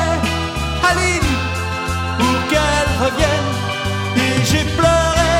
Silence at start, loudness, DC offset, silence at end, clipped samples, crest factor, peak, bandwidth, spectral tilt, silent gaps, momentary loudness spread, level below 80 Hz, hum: 0 s; -17 LUFS; under 0.1%; 0 s; under 0.1%; 16 dB; 0 dBFS; 17 kHz; -4.5 dB/octave; none; 6 LU; -28 dBFS; none